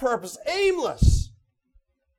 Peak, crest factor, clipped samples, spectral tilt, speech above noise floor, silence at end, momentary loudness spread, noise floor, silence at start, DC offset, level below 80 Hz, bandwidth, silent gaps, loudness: -6 dBFS; 18 dB; under 0.1%; -5.5 dB/octave; 42 dB; 0.95 s; 7 LU; -64 dBFS; 0 s; under 0.1%; -28 dBFS; 14 kHz; none; -24 LUFS